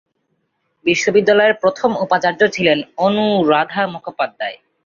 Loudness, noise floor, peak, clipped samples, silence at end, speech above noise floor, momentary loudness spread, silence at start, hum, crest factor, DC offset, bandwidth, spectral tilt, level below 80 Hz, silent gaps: -16 LUFS; -68 dBFS; -2 dBFS; under 0.1%; 0.3 s; 53 dB; 10 LU; 0.85 s; none; 16 dB; under 0.1%; 7.4 kHz; -4.5 dB/octave; -60 dBFS; none